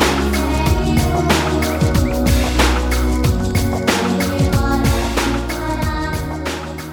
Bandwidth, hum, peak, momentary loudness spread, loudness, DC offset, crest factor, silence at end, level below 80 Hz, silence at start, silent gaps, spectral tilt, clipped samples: 19.5 kHz; none; 0 dBFS; 6 LU; -17 LUFS; under 0.1%; 16 dB; 0 s; -22 dBFS; 0 s; none; -5 dB/octave; under 0.1%